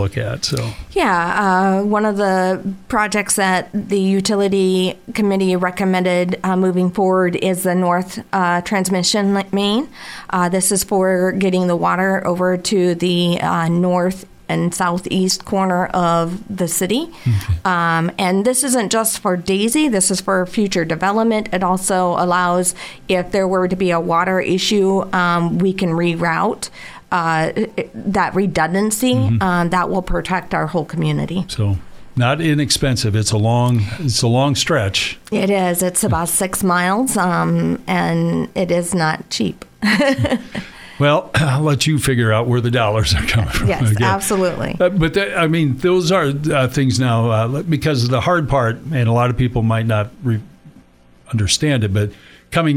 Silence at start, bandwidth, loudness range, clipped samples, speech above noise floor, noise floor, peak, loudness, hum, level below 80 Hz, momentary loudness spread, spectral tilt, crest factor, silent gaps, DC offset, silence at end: 0 s; 16 kHz; 2 LU; under 0.1%; 31 dB; -47 dBFS; -2 dBFS; -17 LUFS; none; -38 dBFS; 5 LU; -5 dB/octave; 14 dB; none; under 0.1%; 0 s